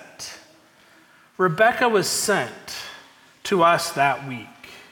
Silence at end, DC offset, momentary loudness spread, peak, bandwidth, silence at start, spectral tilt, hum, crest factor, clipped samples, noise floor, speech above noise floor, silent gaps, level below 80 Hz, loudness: 0.1 s; under 0.1%; 18 LU; -6 dBFS; 18 kHz; 0 s; -3.5 dB/octave; none; 18 dB; under 0.1%; -54 dBFS; 33 dB; none; -64 dBFS; -20 LUFS